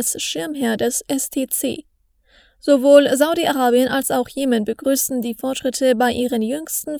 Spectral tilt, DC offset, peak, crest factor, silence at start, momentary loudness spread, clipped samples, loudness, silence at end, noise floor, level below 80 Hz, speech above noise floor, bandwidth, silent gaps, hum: -3 dB/octave; under 0.1%; 0 dBFS; 18 dB; 0 s; 11 LU; under 0.1%; -18 LUFS; 0 s; -57 dBFS; -56 dBFS; 39 dB; over 20 kHz; none; none